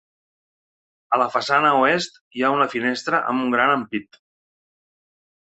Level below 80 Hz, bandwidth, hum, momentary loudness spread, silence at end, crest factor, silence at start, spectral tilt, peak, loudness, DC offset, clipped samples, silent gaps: -66 dBFS; 8.2 kHz; none; 7 LU; 1.45 s; 20 dB; 1.1 s; -4.5 dB/octave; -4 dBFS; -20 LUFS; under 0.1%; under 0.1%; 2.21-2.31 s